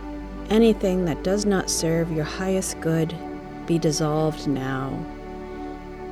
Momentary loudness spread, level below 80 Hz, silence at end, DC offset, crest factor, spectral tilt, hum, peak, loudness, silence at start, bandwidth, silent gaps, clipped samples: 16 LU; -40 dBFS; 0 s; under 0.1%; 18 dB; -5.5 dB/octave; none; -6 dBFS; -23 LUFS; 0 s; 15 kHz; none; under 0.1%